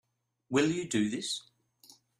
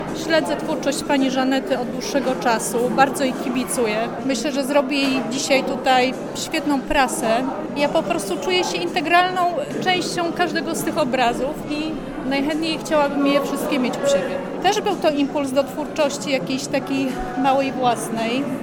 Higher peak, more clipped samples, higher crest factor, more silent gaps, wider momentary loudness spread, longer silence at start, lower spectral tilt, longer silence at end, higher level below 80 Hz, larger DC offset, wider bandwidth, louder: second, -14 dBFS vs -2 dBFS; neither; about the same, 20 dB vs 20 dB; neither; about the same, 7 LU vs 5 LU; first, 0.5 s vs 0 s; about the same, -4 dB/octave vs -4 dB/octave; first, 0.8 s vs 0 s; second, -70 dBFS vs -46 dBFS; neither; second, 14.5 kHz vs 19 kHz; second, -31 LUFS vs -20 LUFS